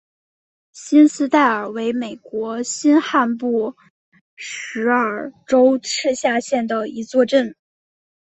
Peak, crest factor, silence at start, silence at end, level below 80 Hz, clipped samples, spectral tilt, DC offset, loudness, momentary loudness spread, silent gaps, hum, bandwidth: -2 dBFS; 18 dB; 0.75 s; 0.75 s; -66 dBFS; under 0.1%; -3.5 dB/octave; under 0.1%; -18 LUFS; 14 LU; 3.90-4.12 s, 4.21-4.37 s; none; 8.4 kHz